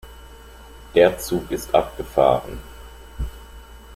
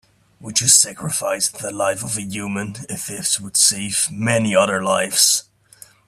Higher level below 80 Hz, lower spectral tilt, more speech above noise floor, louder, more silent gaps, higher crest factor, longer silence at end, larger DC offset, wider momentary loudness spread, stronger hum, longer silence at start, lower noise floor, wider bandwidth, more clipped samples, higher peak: first, -38 dBFS vs -58 dBFS; first, -5 dB/octave vs -2 dB/octave; second, 23 dB vs 28 dB; second, -20 LUFS vs -17 LUFS; neither; about the same, 20 dB vs 20 dB; second, 0 s vs 0.65 s; neither; first, 25 LU vs 13 LU; neither; second, 0.05 s vs 0.4 s; second, -42 dBFS vs -47 dBFS; about the same, 16 kHz vs 16 kHz; neither; about the same, -2 dBFS vs 0 dBFS